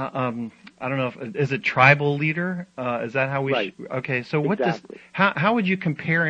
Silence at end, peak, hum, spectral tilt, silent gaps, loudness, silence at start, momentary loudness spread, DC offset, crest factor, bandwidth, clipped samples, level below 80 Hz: 0 s; -2 dBFS; none; -7.5 dB/octave; none; -22 LUFS; 0 s; 13 LU; under 0.1%; 22 dB; 8 kHz; under 0.1%; -64 dBFS